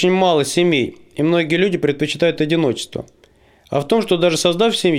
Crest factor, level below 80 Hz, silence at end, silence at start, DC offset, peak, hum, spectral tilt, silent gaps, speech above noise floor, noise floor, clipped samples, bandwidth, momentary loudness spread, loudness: 14 dB; -54 dBFS; 0 s; 0 s; under 0.1%; -2 dBFS; none; -5 dB/octave; none; 36 dB; -52 dBFS; under 0.1%; 16 kHz; 9 LU; -17 LUFS